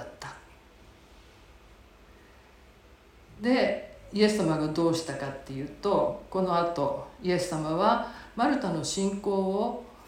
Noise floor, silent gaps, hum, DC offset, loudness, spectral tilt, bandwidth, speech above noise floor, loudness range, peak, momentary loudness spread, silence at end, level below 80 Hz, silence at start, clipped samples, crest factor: -55 dBFS; none; none; under 0.1%; -28 LUFS; -5.5 dB/octave; 16.5 kHz; 28 dB; 6 LU; -10 dBFS; 12 LU; 0 s; -56 dBFS; 0 s; under 0.1%; 20 dB